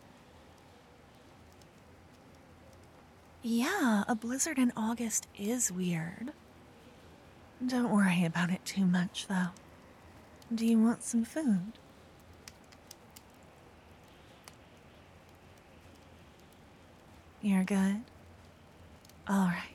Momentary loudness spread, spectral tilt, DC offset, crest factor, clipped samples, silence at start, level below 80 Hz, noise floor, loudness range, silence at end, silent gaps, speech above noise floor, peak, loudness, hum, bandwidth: 25 LU; -5 dB/octave; under 0.1%; 18 dB; under 0.1%; 2.75 s; -68 dBFS; -58 dBFS; 9 LU; 0 s; none; 27 dB; -16 dBFS; -32 LUFS; none; 15.5 kHz